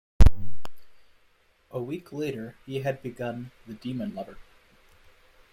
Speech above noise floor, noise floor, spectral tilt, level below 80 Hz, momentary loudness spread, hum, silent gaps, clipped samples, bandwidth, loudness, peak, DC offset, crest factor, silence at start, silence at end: 30 dB; -64 dBFS; -7.5 dB/octave; -30 dBFS; 20 LU; none; none; under 0.1%; 15.5 kHz; -31 LUFS; -2 dBFS; under 0.1%; 22 dB; 0.2 s; 1.3 s